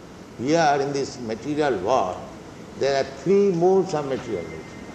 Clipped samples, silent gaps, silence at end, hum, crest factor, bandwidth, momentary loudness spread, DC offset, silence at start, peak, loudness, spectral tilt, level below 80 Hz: under 0.1%; none; 0 s; none; 16 dB; 8.8 kHz; 17 LU; under 0.1%; 0 s; -6 dBFS; -23 LUFS; -5.5 dB/octave; -56 dBFS